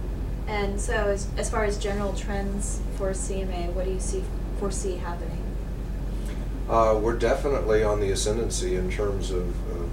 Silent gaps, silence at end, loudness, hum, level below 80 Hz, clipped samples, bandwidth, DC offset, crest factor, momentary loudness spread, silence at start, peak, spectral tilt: none; 0 s; -27 LUFS; none; -30 dBFS; under 0.1%; 13.5 kHz; under 0.1%; 16 dB; 10 LU; 0 s; -10 dBFS; -5 dB/octave